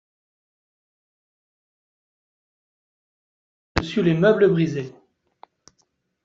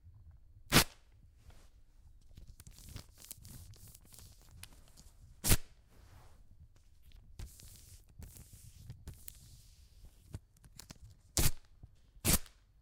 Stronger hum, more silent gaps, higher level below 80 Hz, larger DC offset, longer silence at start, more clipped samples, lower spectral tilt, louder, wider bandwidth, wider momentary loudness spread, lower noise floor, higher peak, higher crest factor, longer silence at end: neither; neither; about the same, -50 dBFS vs -48 dBFS; neither; first, 3.75 s vs 0.7 s; neither; first, -6 dB/octave vs -3 dB/octave; first, -20 LUFS vs -33 LUFS; second, 7.6 kHz vs 17.5 kHz; second, 14 LU vs 25 LU; first, -70 dBFS vs -62 dBFS; first, -2 dBFS vs -8 dBFS; second, 24 dB vs 32 dB; first, 1.35 s vs 0.35 s